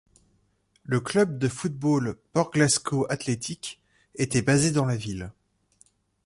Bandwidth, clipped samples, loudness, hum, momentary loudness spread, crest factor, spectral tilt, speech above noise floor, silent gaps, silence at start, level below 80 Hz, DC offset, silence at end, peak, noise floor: 11.5 kHz; under 0.1%; -25 LUFS; 50 Hz at -55 dBFS; 14 LU; 20 dB; -5 dB/octave; 43 dB; none; 0.9 s; -56 dBFS; under 0.1%; 0.95 s; -8 dBFS; -68 dBFS